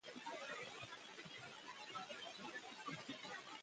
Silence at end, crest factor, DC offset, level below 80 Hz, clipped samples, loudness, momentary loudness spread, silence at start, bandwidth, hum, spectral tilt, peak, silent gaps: 0 s; 16 dB; under 0.1%; -88 dBFS; under 0.1%; -51 LUFS; 4 LU; 0.05 s; 10 kHz; none; -2.5 dB/octave; -36 dBFS; none